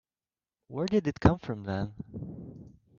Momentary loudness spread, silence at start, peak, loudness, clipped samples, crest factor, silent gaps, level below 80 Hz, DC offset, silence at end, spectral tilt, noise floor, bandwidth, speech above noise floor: 17 LU; 0.7 s; -6 dBFS; -30 LUFS; under 0.1%; 26 dB; none; -48 dBFS; under 0.1%; 0.3 s; -8 dB/octave; under -90 dBFS; 7.2 kHz; over 60 dB